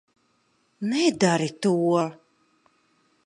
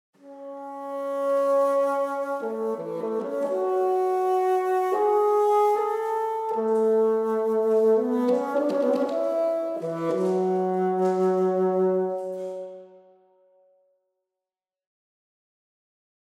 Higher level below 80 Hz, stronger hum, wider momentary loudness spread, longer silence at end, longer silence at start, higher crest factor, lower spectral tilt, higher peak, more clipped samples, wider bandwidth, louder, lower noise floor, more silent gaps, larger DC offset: first, -72 dBFS vs under -90 dBFS; neither; about the same, 9 LU vs 10 LU; second, 1.1 s vs 3.4 s; first, 0.8 s vs 0.25 s; first, 20 dB vs 14 dB; second, -5 dB/octave vs -7.5 dB/octave; first, -6 dBFS vs -12 dBFS; neither; second, 11.5 kHz vs 15 kHz; about the same, -23 LUFS vs -24 LUFS; second, -68 dBFS vs under -90 dBFS; neither; neither